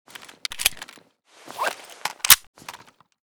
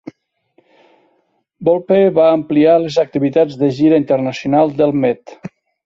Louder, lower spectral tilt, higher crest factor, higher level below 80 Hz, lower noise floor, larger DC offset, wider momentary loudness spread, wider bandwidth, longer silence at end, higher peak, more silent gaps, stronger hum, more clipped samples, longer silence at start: second, -20 LUFS vs -14 LUFS; second, 2 dB/octave vs -7.5 dB/octave; first, 26 dB vs 14 dB; about the same, -54 dBFS vs -56 dBFS; second, -53 dBFS vs -63 dBFS; neither; first, 26 LU vs 8 LU; first, over 20 kHz vs 7.4 kHz; first, 0.55 s vs 0.4 s; about the same, 0 dBFS vs -2 dBFS; first, 2.47-2.54 s vs none; neither; neither; second, 0.5 s vs 1.6 s